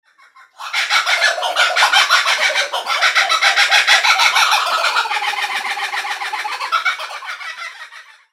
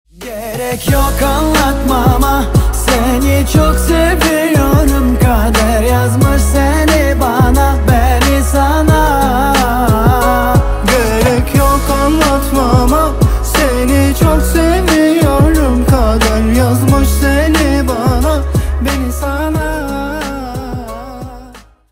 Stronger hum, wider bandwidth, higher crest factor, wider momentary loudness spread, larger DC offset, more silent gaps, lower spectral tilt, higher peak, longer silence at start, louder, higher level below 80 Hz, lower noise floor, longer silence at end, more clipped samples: neither; about the same, 16.5 kHz vs 16.5 kHz; first, 16 dB vs 10 dB; first, 16 LU vs 7 LU; neither; neither; second, 4 dB/octave vs -5.5 dB/octave; about the same, 0 dBFS vs 0 dBFS; first, 0.6 s vs 0.2 s; second, -14 LUFS vs -11 LUFS; second, -80 dBFS vs -16 dBFS; first, -48 dBFS vs -36 dBFS; about the same, 0.3 s vs 0.3 s; neither